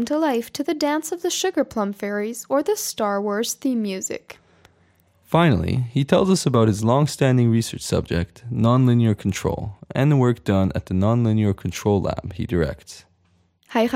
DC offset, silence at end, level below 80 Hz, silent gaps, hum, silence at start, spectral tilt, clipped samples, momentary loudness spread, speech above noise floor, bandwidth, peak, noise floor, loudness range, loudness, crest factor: under 0.1%; 0 s; -46 dBFS; none; none; 0 s; -6 dB/octave; under 0.1%; 9 LU; 42 dB; 16 kHz; -2 dBFS; -62 dBFS; 4 LU; -21 LUFS; 20 dB